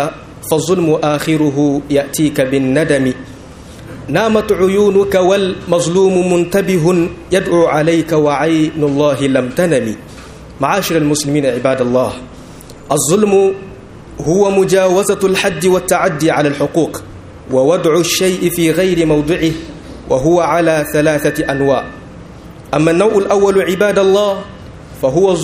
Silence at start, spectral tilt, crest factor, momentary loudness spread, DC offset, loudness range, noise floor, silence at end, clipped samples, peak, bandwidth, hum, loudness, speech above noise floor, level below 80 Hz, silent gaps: 0 s; -5 dB/octave; 14 dB; 16 LU; under 0.1%; 2 LU; -33 dBFS; 0 s; under 0.1%; 0 dBFS; 15.5 kHz; none; -13 LUFS; 21 dB; -40 dBFS; none